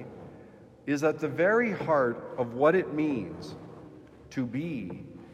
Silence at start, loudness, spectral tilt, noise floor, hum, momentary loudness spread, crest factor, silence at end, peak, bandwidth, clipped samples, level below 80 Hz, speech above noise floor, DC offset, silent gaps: 0 s; -28 LUFS; -7 dB/octave; -52 dBFS; none; 21 LU; 18 dB; 0 s; -10 dBFS; 14 kHz; under 0.1%; -66 dBFS; 24 dB; under 0.1%; none